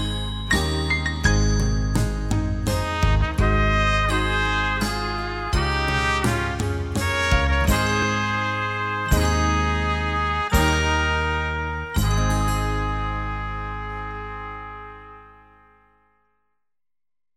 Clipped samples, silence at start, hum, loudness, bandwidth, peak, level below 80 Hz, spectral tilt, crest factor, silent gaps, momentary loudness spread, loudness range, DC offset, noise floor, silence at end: under 0.1%; 0 s; none; -22 LUFS; 15.5 kHz; -4 dBFS; -28 dBFS; -5 dB/octave; 18 dB; none; 10 LU; 10 LU; under 0.1%; under -90 dBFS; 2.05 s